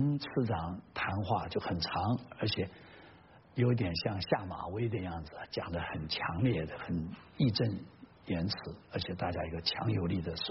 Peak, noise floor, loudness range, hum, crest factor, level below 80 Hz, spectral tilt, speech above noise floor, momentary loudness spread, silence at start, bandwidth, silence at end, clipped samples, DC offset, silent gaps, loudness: -14 dBFS; -58 dBFS; 1 LU; none; 20 dB; -56 dBFS; -5 dB/octave; 23 dB; 10 LU; 0 s; 5.8 kHz; 0 s; under 0.1%; under 0.1%; none; -35 LUFS